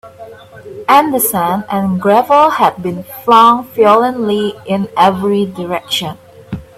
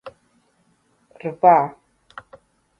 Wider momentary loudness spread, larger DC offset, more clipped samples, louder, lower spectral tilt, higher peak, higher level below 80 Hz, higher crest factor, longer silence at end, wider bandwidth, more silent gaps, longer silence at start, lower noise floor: second, 14 LU vs 27 LU; neither; neither; first, -12 LUFS vs -18 LUFS; second, -4.5 dB/octave vs -8.5 dB/octave; about the same, 0 dBFS vs -2 dBFS; first, -50 dBFS vs -68 dBFS; second, 12 dB vs 22 dB; second, 0.15 s vs 1.1 s; first, 16.5 kHz vs 5.6 kHz; neither; about the same, 0.05 s vs 0.05 s; second, -34 dBFS vs -63 dBFS